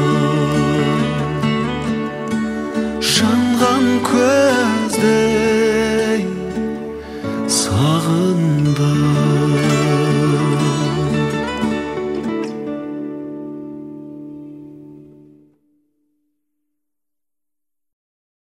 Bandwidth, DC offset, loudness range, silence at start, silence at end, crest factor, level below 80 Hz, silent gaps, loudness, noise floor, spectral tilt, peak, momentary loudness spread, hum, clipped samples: 15 kHz; under 0.1%; 14 LU; 0 s; 3.45 s; 18 dB; -44 dBFS; none; -17 LUFS; -88 dBFS; -5.5 dB/octave; 0 dBFS; 14 LU; none; under 0.1%